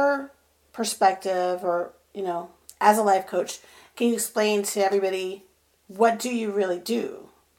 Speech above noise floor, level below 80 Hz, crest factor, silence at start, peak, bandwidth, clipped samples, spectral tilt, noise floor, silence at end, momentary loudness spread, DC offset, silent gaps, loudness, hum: 30 dB; -72 dBFS; 22 dB; 0 s; -4 dBFS; 17.5 kHz; under 0.1%; -3.5 dB/octave; -54 dBFS; 0.35 s; 15 LU; under 0.1%; none; -24 LUFS; none